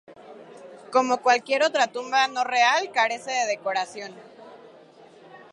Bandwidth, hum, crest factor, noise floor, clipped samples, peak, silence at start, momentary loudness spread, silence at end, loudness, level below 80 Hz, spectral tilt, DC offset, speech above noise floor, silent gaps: 11 kHz; none; 18 dB; -50 dBFS; under 0.1%; -6 dBFS; 0.1 s; 15 LU; 0.15 s; -23 LUFS; -84 dBFS; -1 dB/octave; under 0.1%; 27 dB; none